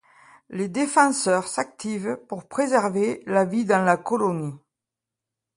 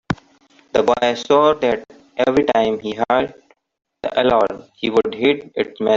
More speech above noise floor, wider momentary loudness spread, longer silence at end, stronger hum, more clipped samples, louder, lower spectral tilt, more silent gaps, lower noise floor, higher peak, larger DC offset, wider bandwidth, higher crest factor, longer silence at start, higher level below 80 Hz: first, 64 dB vs 36 dB; about the same, 12 LU vs 11 LU; first, 1 s vs 0 s; neither; neither; second, -23 LUFS vs -18 LUFS; about the same, -5 dB/octave vs -5.5 dB/octave; neither; first, -87 dBFS vs -54 dBFS; second, -4 dBFS vs 0 dBFS; neither; first, 11.5 kHz vs 7.6 kHz; about the same, 20 dB vs 18 dB; first, 0.5 s vs 0.1 s; second, -70 dBFS vs -50 dBFS